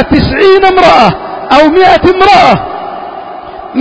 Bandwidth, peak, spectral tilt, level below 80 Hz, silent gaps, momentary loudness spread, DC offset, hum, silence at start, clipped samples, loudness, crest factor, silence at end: 8 kHz; 0 dBFS; -6 dB/octave; -28 dBFS; none; 18 LU; under 0.1%; none; 0 s; 5%; -5 LUFS; 6 dB; 0 s